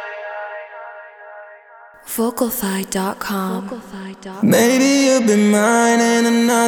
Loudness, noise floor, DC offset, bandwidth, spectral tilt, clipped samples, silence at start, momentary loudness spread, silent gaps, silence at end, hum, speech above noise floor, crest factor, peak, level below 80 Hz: -16 LUFS; -43 dBFS; under 0.1%; 20 kHz; -4 dB/octave; under 0.1%; 0 s; 21 LU; none; 0 s; none; 27 dB; 16 dB; -2 dBFS; -58 dBFS